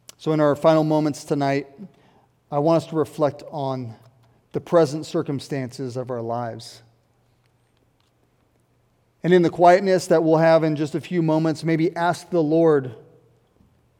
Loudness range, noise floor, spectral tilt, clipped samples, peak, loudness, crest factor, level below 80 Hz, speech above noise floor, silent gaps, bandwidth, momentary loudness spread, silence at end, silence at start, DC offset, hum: 13 LU; -63 dBFS; -7 dB/octave; under 0.1%; -2 dBFS; -21 LUFS; 20 dB; -68 dBFS; 43 dB; none; 15 kHz; 14 LU; 1 s; 0.2 s; under 0.1%; none